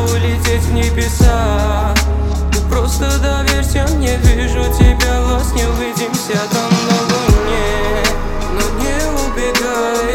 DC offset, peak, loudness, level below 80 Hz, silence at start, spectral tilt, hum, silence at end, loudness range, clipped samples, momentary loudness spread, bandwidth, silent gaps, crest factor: under 0.1%; 0 dBFS; -15 LUFS; -16 dBFS; 0 s; -5 dB/octave; none; 0 s; 1 LU; under 0.1%; 5 LU; 17 kHz; none; 14 dB